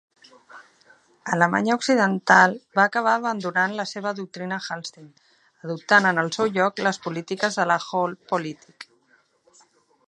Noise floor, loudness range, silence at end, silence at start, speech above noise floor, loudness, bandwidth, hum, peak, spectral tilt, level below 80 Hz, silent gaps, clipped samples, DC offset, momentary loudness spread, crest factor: -63 dBFS; 5 LU; 1.25 s; 0.55 s; 40 dB; -22 LUFS; 11.5 kHz; none; -2 dBFS; -4.5 dB/octave; -72 dBFS; none; under 0.1%; under 0.1%; 16 LU; 22 dB